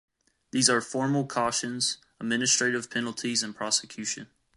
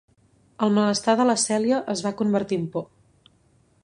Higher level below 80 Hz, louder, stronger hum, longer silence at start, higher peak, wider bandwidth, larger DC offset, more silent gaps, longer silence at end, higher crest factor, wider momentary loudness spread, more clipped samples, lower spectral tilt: about the same, -68 dBFS vs -66 dBFS; second, -27 LUFS vs -23 LUFS; neither; about the same, 0.55 s vs 0.6 s; about the same, -6 dBFS vs -4 dBFS; about the same, 11.5 kHz vs 11 kHz; neither; neither; second, 0.3 s vs 1 s; about the same, 22 dB vs 20 dB; about the same, 10 LU vs 9 LU; neither; second, -2.5 dB/octave vs -4.5 dB/octave